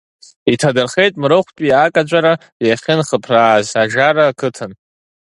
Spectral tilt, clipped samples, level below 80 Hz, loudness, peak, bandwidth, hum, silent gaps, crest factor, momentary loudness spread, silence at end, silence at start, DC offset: -5 dB/octave; under 0.1%; -56 dBFS; -14 LUFS; 0 dBFS; 11.5 kHz; none; 2.52-2.60 s; 14 dB; 7 LU; 0.55 s; 0.45 s; under 0.1%